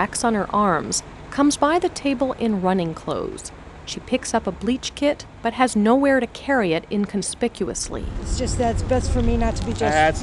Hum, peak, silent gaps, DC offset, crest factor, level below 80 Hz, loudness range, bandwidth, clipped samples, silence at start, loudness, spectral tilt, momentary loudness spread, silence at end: none; -4 dBFS; none; under 0.1%; 18 dB; -32 dBFS; 3 LU; 12 kHz; under 0.1%; 0 s; -22 LUFS; -4.5 dB/octave; 10 LU; 0 s